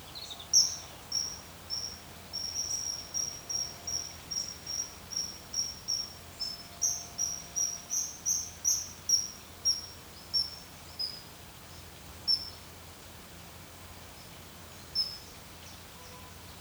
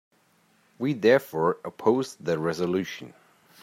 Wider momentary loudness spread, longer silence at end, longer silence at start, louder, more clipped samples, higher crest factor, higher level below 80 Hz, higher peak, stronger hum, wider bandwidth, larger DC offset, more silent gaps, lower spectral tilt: first, 18 LU vs 10 LU; second, 0 s vs 0.55 s; second, 0 s vs 0.8 s; second, -32 LUFS vs -26 LUFS; neither; about the same, 24 dB vs 20 dB; first, -60 dBFS vs -70 dBFS; second, -12 dBFS vs -6 dBFS; neither; first, over 20 kHz vs 16 kHz; neither; neither; second, 0 dB/octave vs -6 dB/octave